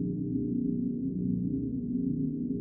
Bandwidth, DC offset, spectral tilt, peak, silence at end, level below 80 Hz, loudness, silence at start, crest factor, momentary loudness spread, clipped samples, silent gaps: 0.8 kHz; under 0.1%; -16.5 dB/octave; -18 dBFS; 0 s; -52 dBFS; -32 LUFS; 0 s; 12 dB; 2 LU; under 0.1%; none